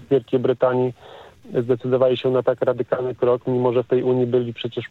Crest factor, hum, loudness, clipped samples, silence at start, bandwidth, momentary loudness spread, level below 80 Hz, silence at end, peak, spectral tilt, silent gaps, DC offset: 16 dB; none; -21 LUFS; under 0.1%; 0 s; 4.3 kHz; 7 LU; -64 dBFS; 0.05 s; -4 dBFS; -9 dB/octave; none; under 0.1%